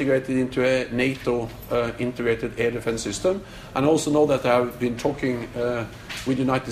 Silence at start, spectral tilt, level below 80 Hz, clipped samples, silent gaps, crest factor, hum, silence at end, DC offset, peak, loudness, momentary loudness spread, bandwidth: 0 s; -5.5 dB/octave; -48 dBFS; under 0.1%; none; 16 dB; none; 0 s; under 0.1%; -6 dBFS; -24 LUFS; 7 LU; 15.5 kHz